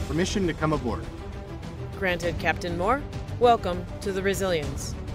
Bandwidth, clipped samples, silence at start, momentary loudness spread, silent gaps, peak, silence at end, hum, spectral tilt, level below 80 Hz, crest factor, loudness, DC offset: 16 kHz; under 0.1%; 0 s; 15 LU; none; -8 dBFS; 0 s; none; -5.5 dB/octave; -38 dBFS; 18 dB; -26 LUFS; under 0.1%